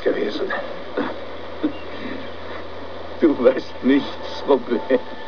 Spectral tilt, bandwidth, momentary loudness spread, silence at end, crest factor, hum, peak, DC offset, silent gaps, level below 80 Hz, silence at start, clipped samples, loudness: -6.5 dB/octave; 5.4 kHz; 15 LU; 0 s; 20 dB; none; -2 dBFS; 3%; none; -54 dBFS; 0 s; under 0.1%; -22 LUFS